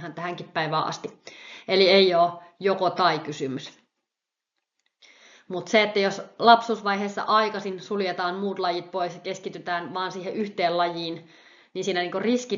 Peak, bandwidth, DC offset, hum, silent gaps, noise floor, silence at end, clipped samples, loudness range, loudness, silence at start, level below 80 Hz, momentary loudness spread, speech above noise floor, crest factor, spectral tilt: -4 dBFS; 7.4 kHz; under 0.1%; none; none; -87 dBFS; 0 s; under 0.1%; 6 LU; -24 LUFS; 0 s; -76 dBFS; 17 LU; 62 dB; 22 dB; -2.5 dB/octave